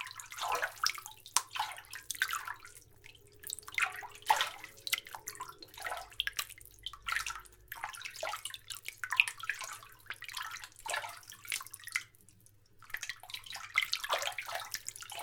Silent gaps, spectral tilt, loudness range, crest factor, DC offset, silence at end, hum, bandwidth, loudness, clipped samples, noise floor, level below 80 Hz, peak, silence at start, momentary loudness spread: none; 1.5 dB/octave; 5 LU; 38 dB; under 0.1%; 0 s; none; over 20 kHz; -37 LUFS; under 0.1%; -63 dBFS; -68 dBFS; -2 dBFS; 0 s; 15 LU